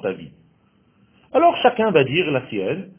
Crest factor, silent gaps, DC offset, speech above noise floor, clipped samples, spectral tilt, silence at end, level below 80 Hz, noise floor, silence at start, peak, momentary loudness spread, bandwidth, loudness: 20 dB; none; under 0.1%; 40 dB; under 0.1%; -9.5 dB/octave; 0.15 s; -58 dBFS; -59 dBFS; 0.05 s; 0 dBFS; 10 LU; 3.5 kHz; -19 LUFS